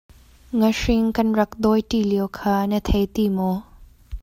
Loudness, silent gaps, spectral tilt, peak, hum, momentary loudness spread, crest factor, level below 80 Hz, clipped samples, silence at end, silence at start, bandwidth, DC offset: -21 LUFS; none; -6.5 dB/octave; -6 dBFS; none; 5 LU; 16 dB; -36 dBFS; under 0.1%; 0 s; 0.5 s; 16 kHz; under 0.1%